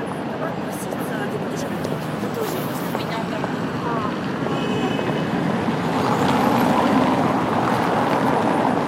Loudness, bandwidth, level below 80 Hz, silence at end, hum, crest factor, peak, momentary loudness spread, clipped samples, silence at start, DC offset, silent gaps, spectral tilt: -22 LUFS; 16 kHz; -52 dBFS; 0 s; none; 16 dB; -6 dBFS; 8 LU; under 0.1%; 0 s; under 0.1%; none; -6 dB/octave